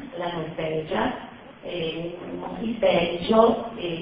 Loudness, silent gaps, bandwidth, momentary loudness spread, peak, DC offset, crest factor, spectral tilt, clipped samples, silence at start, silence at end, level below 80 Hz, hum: -25 LUFS; none; 5.2 kHz; 15 LU; -4 dBFS; under 0.1%; 22 dB; -10 dB/octave; under 0.1%; 0 s; 0 s; -52 dBFS; none